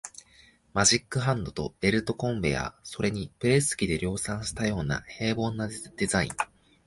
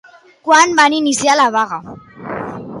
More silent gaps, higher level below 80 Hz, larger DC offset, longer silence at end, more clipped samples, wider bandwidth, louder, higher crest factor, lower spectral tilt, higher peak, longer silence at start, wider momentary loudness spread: neither; first, -48 dBFS vs -56 dBFS; neither; first, 0.4 s vs 0 s; neither; about the same, 11.5 kHz vs 11.5 kHz; second, -28 LUFS vs -12 LUFS; about the same, 20 dB vs 16 dB; first, -4 dB/octave vs -2 dB/octave; second, -8 dBFS vs 0 dBFS; second, 0.05 s vs 0.45 s; second, 10 LU vs 17 LU